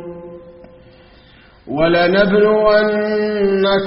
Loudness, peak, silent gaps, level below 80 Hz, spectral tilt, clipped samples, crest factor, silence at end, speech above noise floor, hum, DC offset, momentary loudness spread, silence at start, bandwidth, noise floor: -14 LUFS; 0 dBFS; none; -44 dBFS; -4 dB/octave; under 0.1%; 16 dB; 0 s; 32 dB; none; under 0.1%; 18 LU; 0 s; 5.6 kHz; -46 dBFS